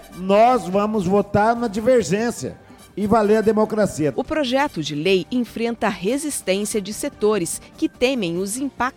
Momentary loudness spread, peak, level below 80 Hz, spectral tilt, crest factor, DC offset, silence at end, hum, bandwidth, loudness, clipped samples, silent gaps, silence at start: 9 LU; -2 dBFS; -48 dBFS; -5 dB/octave; 18 dB; under 0.1%; 0.05 s; none; 18.5 kHz; -20 LUFS; under 0.1%; none; 0 s